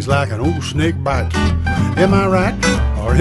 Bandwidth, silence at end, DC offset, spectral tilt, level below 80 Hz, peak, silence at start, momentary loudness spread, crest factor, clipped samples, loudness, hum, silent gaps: 11.5 kHz; 0 s; under 0.1%; -6 dB/octave; -24 dBFS; 0 dBFS; 0 s; 5 LU; 14 dB; under 0.1%; -16 LUFS; none; none